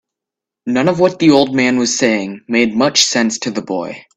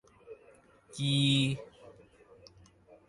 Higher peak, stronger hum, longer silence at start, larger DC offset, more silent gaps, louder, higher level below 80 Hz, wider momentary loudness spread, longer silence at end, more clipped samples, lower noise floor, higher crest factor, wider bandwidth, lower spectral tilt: first, 0 dBFS vs -16 dBFS; neither; first, 0.65 s vs 0.3 s; neither; neither; first, -14 LUFS vs -29 LUFS; first, -56 dBFS vs -66 dBFS; second, 10 LU vs 27 LU; second, 0.15 s vs 1.45 s; neither; first, -84 dBFS vs -61 dBFS; about the same, 14 dB vs 18 dB; about the same, 12.5 kHz vs 11.5 kHz; second, -3.5 dB/octave vs -5 dB/octave